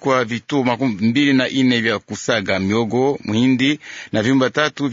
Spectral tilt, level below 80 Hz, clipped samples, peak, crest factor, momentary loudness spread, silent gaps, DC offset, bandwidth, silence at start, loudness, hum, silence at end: -5 dB/octave; -60 dBFS; under 0.1%; -2 dBFS; 16 dB; 5 LU; none; under 0.1%; 7.8 kHz; 0 s; -18 LUFS; none; 0 s